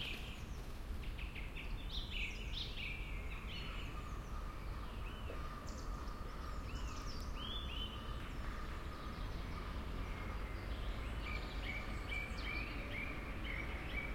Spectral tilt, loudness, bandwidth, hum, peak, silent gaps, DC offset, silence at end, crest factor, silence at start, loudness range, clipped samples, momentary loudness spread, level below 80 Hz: -5 dB/octave; -46 LUFS; 16.5 kHz; none; -28 dBFS; none; under 0.1%; 0 s; 14 dB; 0 s; 4 LU; under 0.1%; 5 LU; -46 dBFS